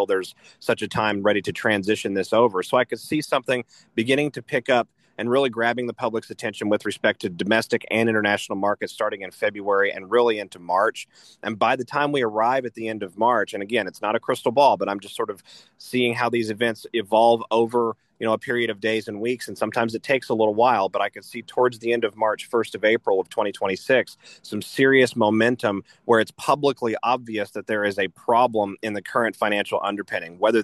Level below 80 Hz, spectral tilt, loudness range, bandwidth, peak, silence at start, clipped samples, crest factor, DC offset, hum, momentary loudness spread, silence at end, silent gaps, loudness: -68 dBFS; -5 dB/octave; 2 LU; 12.5 kHz; -4 dBFS; 0 s; under 0.1%; 18 dB; under 0.1%; none; 10 LU; 0 s; none; -23 LUFS